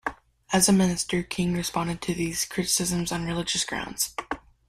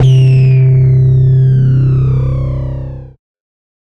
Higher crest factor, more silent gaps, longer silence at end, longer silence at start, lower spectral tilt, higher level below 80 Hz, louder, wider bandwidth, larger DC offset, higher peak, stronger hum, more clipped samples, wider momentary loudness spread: first, 20 dB vs 8 dB; neither; second, 0.3 s vs 0.8 s; about the same, 0.05 s vs 0 s; second, -3.5 dB/octave vs -9.5 dB/octave; second, -50 dBFS vs -26 dBFS; second, -25 LUFS vs -10 LUFS; first, 16 kHz vs 3.6 kHz; neither; second, -6 dBFS vs -2 dBFS; neither; neither; second, 9 LU vs 14 LU